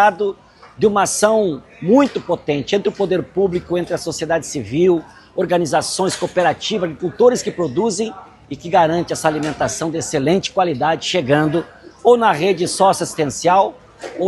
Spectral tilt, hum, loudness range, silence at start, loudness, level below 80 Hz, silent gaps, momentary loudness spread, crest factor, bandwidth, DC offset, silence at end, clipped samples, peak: -4.5 dB/octave; none; 3 LU; 0 s; -17 LUFS; -52 dBFS; none; 9 LU; 16 dB; 12.5 kHz; under 0.1%; 0 s; under 0.1%; 0 dBFS